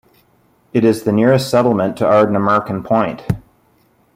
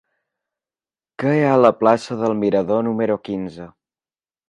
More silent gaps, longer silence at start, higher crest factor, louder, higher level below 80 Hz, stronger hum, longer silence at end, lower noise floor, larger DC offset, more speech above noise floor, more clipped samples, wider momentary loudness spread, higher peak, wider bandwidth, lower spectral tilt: neither; second, 0.75 s vs 1.2 s; about the same, 16 dB vs 20 dB; first, -15 LUFS vs -18 LUFS; first, -48 dBFS vs -60 dBFS; neither; about the same, 0.75 s vs 0.8 s; second, -56 dBFS vs under -90 dBFS; neither; second, 42 dB vs over 72 dB; neither; second, 9 LU vs 13 LU; about the same, -2 dBFS vs 0 dBFS; first, 16 kHz vs 10.5 kHz; about the same, -7 dB/octave vs -7.5 dB/octave